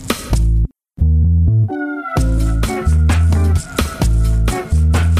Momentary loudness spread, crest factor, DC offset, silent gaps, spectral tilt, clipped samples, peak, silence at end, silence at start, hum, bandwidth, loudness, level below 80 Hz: 6 LU; 12 dB; under 0.1%; none; -6.5 dB/octave; under 0.1%; -2 dBFS; 0 s; 0 s; none; 15.5 kHz; -16 LUFS; -16 dBFS